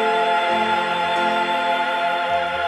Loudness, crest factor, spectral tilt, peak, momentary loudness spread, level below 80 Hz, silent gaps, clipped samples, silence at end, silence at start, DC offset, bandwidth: -20 LUFS; 12 dB; -3.5 dB/octave; -8 dBFS; 2 LU; -62 dBFS; none; under 0.1%; 0 s; 0 s; under 0.1%; 12.5 kHz